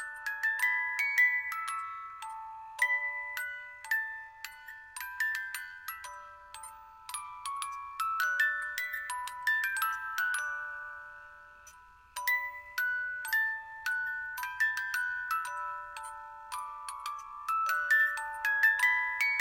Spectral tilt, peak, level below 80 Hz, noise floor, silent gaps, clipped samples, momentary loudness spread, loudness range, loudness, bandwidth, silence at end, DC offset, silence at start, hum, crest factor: 2.5 dB/octave; -16 dBFS; -70 dBFS; -56 dBFS; none; under 0.1%; 18 LU; 7 LU; -31 LUFS; 16.5 kHz; 0 s; under 0.1%; 0 s; none; 20 dB